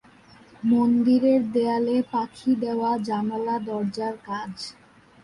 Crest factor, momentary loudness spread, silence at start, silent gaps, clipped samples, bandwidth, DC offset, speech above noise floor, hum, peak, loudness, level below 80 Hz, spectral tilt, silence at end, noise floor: 14 dB; 13 LU; 0.6 s; none; under 0.1%; 11 kHz; under 0.1%; 29 dB; none; -10 dBFS; -24 LUFS; -64 dBFS; -7 dB/octave; 0.5 s; -52 dBFS